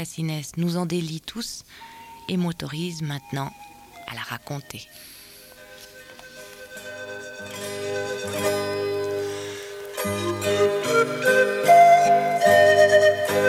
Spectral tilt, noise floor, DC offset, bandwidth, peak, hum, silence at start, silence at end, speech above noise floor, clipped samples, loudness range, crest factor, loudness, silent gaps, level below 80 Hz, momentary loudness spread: -4.5 dB/octave; -46 dBFS; under 0.1%; 16.5 kHz; -4 dBFS; none; 0 s; 0 s; 18 dB; under 0.1%; 20 LU; 18 dB; -21 LUFS; none; -62 dBFS; 26 LU